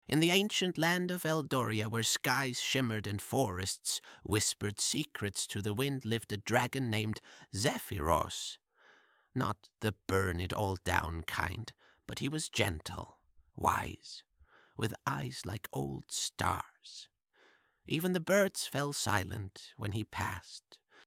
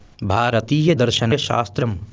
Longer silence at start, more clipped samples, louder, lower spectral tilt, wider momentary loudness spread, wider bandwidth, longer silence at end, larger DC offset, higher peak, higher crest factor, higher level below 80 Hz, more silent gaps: about the same, 0.1 s vs 0.2 s; neither; second, -34 LUFS vs -19 LUFS; second, -4 dB/octave vs -5.5 dB/octave; first, 14 LU vs 6 LU; first, 17 kHz vs 8 kHz; first, 0.3 s vs 0 s; neither; second, -12 dBFS vs -4 dBFS; first, 22 dB vs 16 dB; second, -58 dBFS vs -40 dBFS; neither